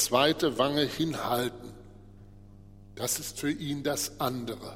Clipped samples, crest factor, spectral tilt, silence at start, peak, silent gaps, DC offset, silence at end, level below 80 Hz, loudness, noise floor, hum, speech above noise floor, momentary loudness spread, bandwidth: under 0.1%; 22 dB; -3.5 dB/octave; 0 s; -8 dBFS; none; under 0.1%; 0 s; -56 dBFS; -29 LUFS; -50 dBFS; 50 Hz at -55 dBFS; 21 dB; 11 LU; 16.5 kHz